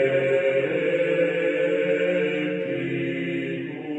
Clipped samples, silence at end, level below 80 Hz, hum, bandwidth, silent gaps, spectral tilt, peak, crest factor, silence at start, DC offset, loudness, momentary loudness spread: under 0.1%; 0 s; -70 dBFS; none; 8.4 kHz; none; -7 dB/octave; -10 dBFS; 14 dB; 0 s; under 0.1%; -24 LUFS; 6 LU